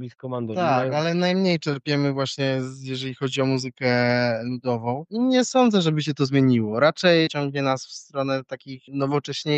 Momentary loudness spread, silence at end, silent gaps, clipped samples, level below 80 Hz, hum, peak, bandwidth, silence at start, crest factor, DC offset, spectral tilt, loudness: 10 LU; 0 s; none; under 0.1%; -68 dBFS; none; -6 dBFS; 8.6 kHz; 0 s; 18 dB; under 0.1%; -5.5 dB/octave; -23 LUFS